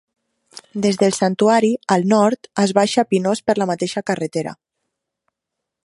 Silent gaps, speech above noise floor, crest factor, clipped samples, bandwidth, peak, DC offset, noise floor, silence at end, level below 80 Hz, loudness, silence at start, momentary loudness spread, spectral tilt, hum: none; 64 dB; 18 dB; under 0.1%; 11.5 kHz; 0 dBFS; under 0.1%; -81 dBFS; 1.3 s; -64 dBFS; -18 LUFS; 0.55 s; 7 LU; -5 dB/octave; none